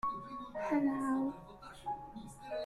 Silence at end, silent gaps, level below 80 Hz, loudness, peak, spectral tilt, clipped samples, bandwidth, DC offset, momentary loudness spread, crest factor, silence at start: 0 s; none; -64 dBFS; -38 LUFS; -22 dBFS; -6 dB/octave; under 0.1%; 12.5 kHz; under 0.1%; 16 LU; 16 dB; 0.05 s